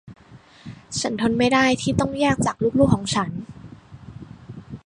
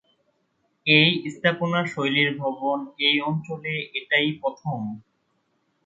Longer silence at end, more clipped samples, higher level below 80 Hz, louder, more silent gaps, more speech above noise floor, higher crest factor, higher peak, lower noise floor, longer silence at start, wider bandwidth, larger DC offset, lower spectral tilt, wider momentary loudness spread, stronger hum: second, 0.05 s vs 0.85 s; neither; first, -44 dBFS vs -68 dBFS; about the same, -21 LUFS vs -22 LUFS; neither; second, 28 dB vs 47 dB; about the same, 20 dB vs 22 dB; about the same, -2 dBFS vs -4 dBFS; second, -48 dBFS vs -71 dBFS; second, 0.05 s vs 0.85 s; first, 11 kHz vs 7.8 kHz; neither; about the same, -5 dB/octave vs -6 dB/octave; first, 23 LU vs 13 LU; neither